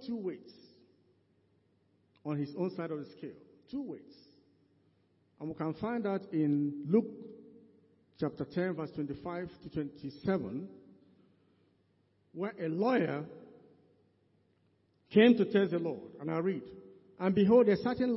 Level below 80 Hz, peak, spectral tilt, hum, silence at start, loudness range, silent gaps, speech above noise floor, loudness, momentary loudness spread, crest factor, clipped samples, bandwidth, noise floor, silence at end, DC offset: -70 dBFS; -12 dBFS; -10.5 dB/octave; none; 0 s; 11 LU; none; 40 dB; -33 LUFS; 21 LU; 22 dB; under 0.1%; 5.8 kHz; -72 dBFS; 0 s; under 0.1%